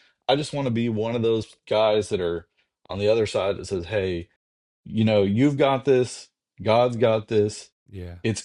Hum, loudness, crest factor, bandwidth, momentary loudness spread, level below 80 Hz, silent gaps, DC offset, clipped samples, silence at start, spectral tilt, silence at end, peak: none; -23 LUFS; 18 dB; 11 kHz; 13 LU; -58 dBFS; 4.36-4.84 s, 7.72-7.86 s; under 0.1%; under 0.1%; 0.3 s; -6 dB/octave; 0 s; -6 dBFS